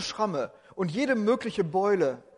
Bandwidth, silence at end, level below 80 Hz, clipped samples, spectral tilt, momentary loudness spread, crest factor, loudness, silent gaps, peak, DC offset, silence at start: 11 kHz; 0.2 s; -66 dBFS; under 0.1%; -5.5 dB/octave; 9 LU; 14 dB; -28 LUFS; none; -14 dBFS; under 0.1%; 0 s